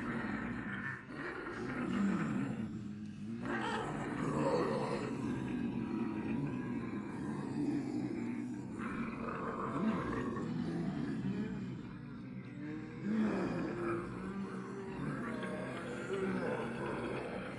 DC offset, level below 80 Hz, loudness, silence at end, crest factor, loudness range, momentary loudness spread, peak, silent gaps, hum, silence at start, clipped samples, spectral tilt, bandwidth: under 0.1%; -62 dBFS; -39 LUFS; 0 s; 16 dB; 3 LU; 8 LU; -22 dBFS; none; none; 0 s; under 0.1%; -7 dB/octave; 11.5 kHz